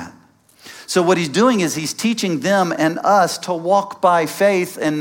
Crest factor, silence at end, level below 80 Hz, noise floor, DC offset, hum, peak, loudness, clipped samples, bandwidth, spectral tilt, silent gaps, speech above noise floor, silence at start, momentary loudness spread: 16 dB; 0 s; -66 dBFS; -50 dBFS; under 0.1%; none; -2 dBFS; -17 LUFS; under 0.1%; 17 kHz; -4.5 dB/octave; none; 34 dB; 0 s; 6 LU